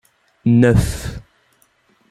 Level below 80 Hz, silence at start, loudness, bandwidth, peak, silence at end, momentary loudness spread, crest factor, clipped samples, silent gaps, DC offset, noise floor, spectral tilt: -32 dBFS; 0.45 s; -16 LUFS; 14 kHz; -2 dBFS; 0.9 s; 18 LU; 16 dB; under 0.1%; none; under 0.1%; -59 dBFS; -7 dB/octave